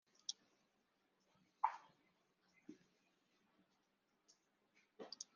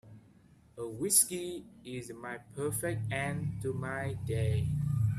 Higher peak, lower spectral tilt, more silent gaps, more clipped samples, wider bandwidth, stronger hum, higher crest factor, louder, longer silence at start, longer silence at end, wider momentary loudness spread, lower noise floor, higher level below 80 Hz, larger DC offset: second, -22 dBFS vs -12 dBFS; second, 0.5 dB/octave vs -4.5 dB/octave; neither; neither; second, 7 kHz vs 15.5 kHz; neither; first, 34 dB vs 22 dB; second, -48 LUFS vs -33 LUFS; first, 0.3 s vs 0.05 s; about the same, 0.1 s vs 0 s; first, 21 LU vs 17 LU; first, -84 dBFS vs -61 dBFS; second, under -90 dBFS vs -56 dBFS; neither